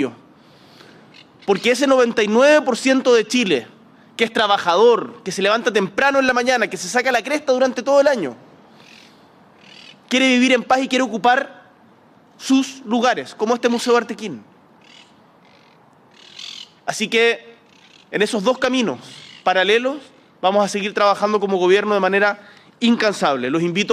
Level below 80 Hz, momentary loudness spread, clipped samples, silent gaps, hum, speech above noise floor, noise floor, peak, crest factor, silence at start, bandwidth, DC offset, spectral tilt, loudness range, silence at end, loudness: -66 dBFS; 13 LU; under 0.1%; none; none; 34 dB; -51 dBFS; -2 dBFS; 16 dB; 0 s; 14 kHz; under 0.1%; -3.5 dB/octave; 7 LU; 0 s; -17 LUFS